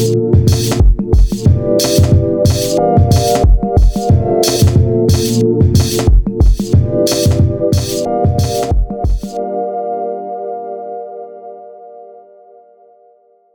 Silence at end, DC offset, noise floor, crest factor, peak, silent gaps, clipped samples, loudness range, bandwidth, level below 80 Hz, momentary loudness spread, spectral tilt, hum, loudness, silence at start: 1.35 s; under 0.1%; -49 dBFS; 12 dB; 0 dBFS; none; under 0.1%; 12 LU; over 20 kHz; -18 dBFS; 12 LU; -6 dB/octave; none; -13 LUFS; 0 s